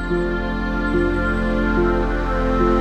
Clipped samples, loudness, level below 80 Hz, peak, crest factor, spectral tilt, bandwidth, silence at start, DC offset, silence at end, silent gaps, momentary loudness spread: under 0.1%; -20 LUFS; -24 dBFS; -6 dBFS; 14 dB; -8 dB/octave; 8.4 kHz; 0 s; under 0.1%; 0 s; none; 4 LU